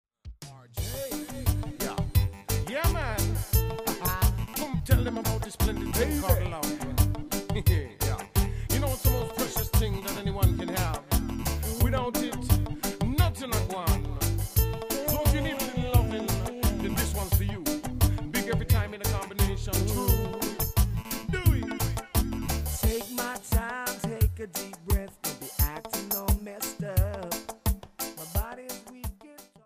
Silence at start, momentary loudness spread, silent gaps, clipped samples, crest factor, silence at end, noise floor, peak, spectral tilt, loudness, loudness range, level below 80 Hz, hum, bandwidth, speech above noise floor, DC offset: 0.25 s; 7 LU; none; under 0.1%; 20 dB; 0.2 s; -51 dBFS; -8 dBFS; -5 dB/octave; -29 LUFS; 3 LU; -32 dBFS; none; 16 kHz; 25 dB; under 0.1%